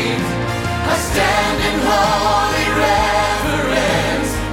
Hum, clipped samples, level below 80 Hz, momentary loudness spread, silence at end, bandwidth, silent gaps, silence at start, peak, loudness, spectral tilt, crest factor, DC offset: none; under 0.1%; -30 dBFS; 5 LU; 0 s; 17.5 kHz; none; 0 s; -4 dBFS; -16 LUFS; -4 dB/octave; 14 dB; under 0.1%